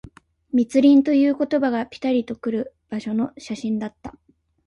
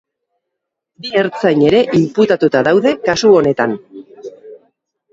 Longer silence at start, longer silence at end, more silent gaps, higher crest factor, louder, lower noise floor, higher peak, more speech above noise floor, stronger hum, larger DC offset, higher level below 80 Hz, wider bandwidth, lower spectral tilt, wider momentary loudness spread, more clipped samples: second, 0.55 s vs 1.05 s; about the same, 0.55 s vs 0.55 s; neither; about the same, 16 dB vs 14 dB; second, -21 LUFS vs -13 LUFS; second, -44 dBFS vs -77 dBFS; second, -6 dBFS vs 0 dBFS; second, 24 dB vs 65 dB; neither; neither; second, -58 dBFS vs -52 dBFS; first, 10.5 kHz vs 7.8 kHz; about the same, -6.5 dB/octave vs -5.5 dB/octave; second, 16 LU vs 21 LU; neither